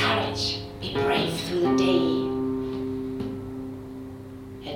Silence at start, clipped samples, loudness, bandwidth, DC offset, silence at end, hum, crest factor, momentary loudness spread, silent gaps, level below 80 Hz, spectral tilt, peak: 0 s; under 0.1%; -26 LUFS; 16 kHz; under 0.1%; 0 s; none; 16 dB; 17 LU; none; -50 dBFS; -5 dB/octave; -10 dBFS